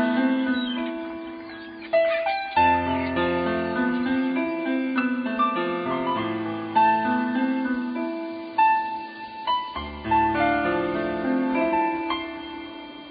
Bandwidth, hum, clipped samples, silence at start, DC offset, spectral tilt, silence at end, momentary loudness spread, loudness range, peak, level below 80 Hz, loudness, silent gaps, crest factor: 5 kHz; none; under 0.1%; 0 s; under 0.1%; -10 dB/octave; 0 s; 13 LU; 1 LU; -8 dBFS; -50 dBFS; -24 LUFS; none; 16 dB